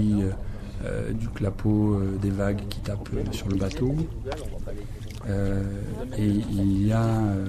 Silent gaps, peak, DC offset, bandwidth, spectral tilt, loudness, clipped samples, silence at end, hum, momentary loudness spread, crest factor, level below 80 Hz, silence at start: none; -12 dBFS; under 0.1%; 13.5 kHz; -8 dB/octave; -27 LUFS; under 0.1%; 0 s; none; 13 LU; 12 dB; -36 dBFS; 0 s